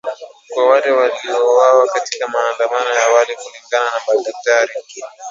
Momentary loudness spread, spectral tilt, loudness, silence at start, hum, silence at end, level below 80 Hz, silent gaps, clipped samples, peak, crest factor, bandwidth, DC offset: 16 LU; 0 dB/octave; -15 LUFS; 0.05 s; none; 0 s; -74 dBFS; none; under 0.1%; 0 dBFS; 16 dB; 7.8 kHz; under 0.1%